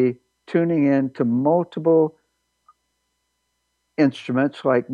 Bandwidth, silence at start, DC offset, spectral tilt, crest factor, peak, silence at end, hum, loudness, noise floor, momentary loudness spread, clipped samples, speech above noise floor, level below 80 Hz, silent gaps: 7.2 kHz; 0 s; under 0.1%; -8.5 dB/octave; 16 dB; -6 dBFS; 0 s; 60 Hz at -55 dBFS; -20 LUFS; -73 dBFS; 7 LU; under 0.1%; 54 dB; -72 dBFS; none